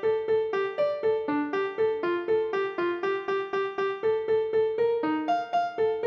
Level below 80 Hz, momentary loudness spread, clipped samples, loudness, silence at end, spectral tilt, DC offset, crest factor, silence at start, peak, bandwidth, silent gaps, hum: -70 dBFS; 3 LU; under 0.1%; -27 LUFS; 0 s; -6 dB/octave; under 0.1%; 10 dB; 0 s; -16 dBFS; 6.8 kHz; none; none